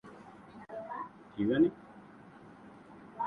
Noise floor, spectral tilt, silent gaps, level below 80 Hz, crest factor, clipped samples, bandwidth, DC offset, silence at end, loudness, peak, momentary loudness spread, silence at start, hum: -54 dBFS; -8.5 dB/octave; none; -68 dBFS; 20 dB; under 0.1%; 4.6 kHz; under 0.1%; 0 s; -33 LUFS; -16 dBFS; 25 LU; 0.05 s; none